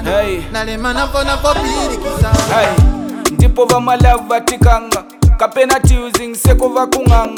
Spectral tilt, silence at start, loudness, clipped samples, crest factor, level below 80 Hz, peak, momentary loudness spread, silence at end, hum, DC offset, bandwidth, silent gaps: -5 dB/octave; 0 s; -13 LUFS; under 0.1%; 12 dB; -18 dBFS; 0 dBFS; 7 LU; 0 s; none; under 0.1%; 18.5 kHz; none